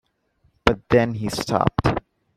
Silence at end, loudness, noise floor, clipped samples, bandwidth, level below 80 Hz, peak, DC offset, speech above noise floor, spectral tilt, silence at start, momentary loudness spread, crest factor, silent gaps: 0.4 s; -22 LUFS; -65 dBFS; under 0.1%; 14.5 kHz; -38 dBFS; 0 dBFS; under 0.1%; 45 dB; -6 dB/octave; 0.65 s; 6 LU; 22 dB; none